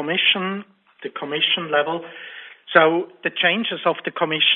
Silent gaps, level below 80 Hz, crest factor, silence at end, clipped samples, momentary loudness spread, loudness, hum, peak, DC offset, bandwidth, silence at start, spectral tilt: none; -72 dBFS; 22 dB; 0 s; under 0.1%; 19 LU; -20 LUFS; none; 0 dBFS; under 0.1%; 4.2 kHz; 0 s; -8 dB/octave